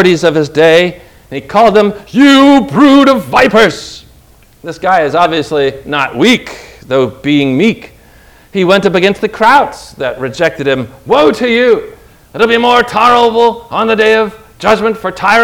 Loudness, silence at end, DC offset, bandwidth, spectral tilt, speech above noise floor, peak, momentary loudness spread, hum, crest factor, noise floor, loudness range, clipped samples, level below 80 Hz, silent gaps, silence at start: -9 LUFS; 0 s; under 0.1%; 17 kHz; -5 dB/octave; 33 dB; 0 dBFS; 12 LU; none; 10 dB; -42 dBFS; 5 LU; 3%; -42 dBFS; none; 0 s